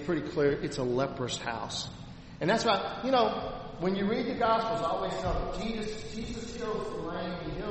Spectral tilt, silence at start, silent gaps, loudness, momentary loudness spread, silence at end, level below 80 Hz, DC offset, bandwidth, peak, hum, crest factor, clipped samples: -5 dB/octave; 0 s; none; -31 LUFS; 11 LU; 0 s; -46 dBFS; under 0.1%; 8.4 kHz; -12 dBFS; none; 20 dB; under 0.1%